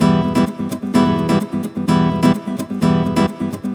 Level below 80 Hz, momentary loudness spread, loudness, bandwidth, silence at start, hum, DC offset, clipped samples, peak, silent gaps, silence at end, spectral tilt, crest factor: -42 dBFS; 8 LU; -17 LUFS; 16 kHz; 0 s; none; under 0.1%; under 0.1%; -2 dBFS; none; 0 s; -7 dB/octave; 14 dB